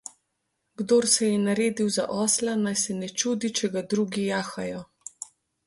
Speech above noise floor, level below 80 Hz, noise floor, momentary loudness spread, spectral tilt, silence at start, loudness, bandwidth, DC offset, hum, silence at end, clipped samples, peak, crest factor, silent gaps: 52 dB; -66 dBFS; -78 dBFS; 18 LU; -3.5 dB/octave; 0.8 s; -25 LUFS; 12 kHz; under 0.1%; none; 0.45 s; under 0.1%; -8 dBFS; 18 dB; none